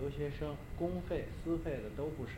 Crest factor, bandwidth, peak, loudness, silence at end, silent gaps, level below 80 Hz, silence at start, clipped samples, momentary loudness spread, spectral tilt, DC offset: 16 dB; 16 kHz; -24 dBFS; -40 LUFS; 0 s; none; -48 dBFS; 0 s; under 0.1%; 4 LU; -8 dB/octave; under 0.1%